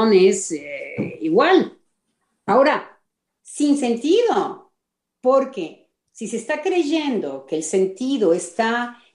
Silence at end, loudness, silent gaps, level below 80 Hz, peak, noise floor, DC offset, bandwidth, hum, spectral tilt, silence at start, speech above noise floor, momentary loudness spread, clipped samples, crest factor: 0.2 s; -20 LUFS; none; -70 dBFS; -4 dBFS; -79 dBFS; under 0.1%; 11 kHz; none; -4.5 dB/octave; 0 s; 60 dB; 13 LU; under 0.1%; 16 dB